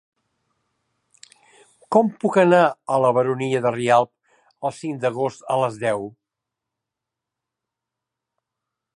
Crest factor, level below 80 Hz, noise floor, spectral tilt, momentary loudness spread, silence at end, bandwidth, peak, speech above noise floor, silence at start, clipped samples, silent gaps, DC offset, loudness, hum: 20 dB; -70 dBFS; -85 dBFS; -6.5 dB/octave; 13 LU; 2.85 s; 11 kHz; -2 dBFS; 65 dB; 1.9 s; under 0.1%; none; under 0.1%; -20 LUFS; none